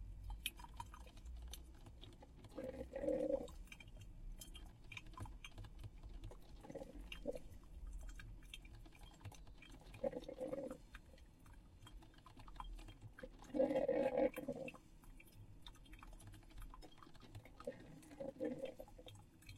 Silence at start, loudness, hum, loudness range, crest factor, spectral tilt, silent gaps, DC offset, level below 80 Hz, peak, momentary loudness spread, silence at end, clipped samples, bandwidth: 0 s; -48 LUFS; none; 13 LU; 24 dB; -5.5 dB/octave; none; under 0.1%; -58 dBFS; -26 dBFS; 20 LU; 0 s; under 0.1%; 16 kHz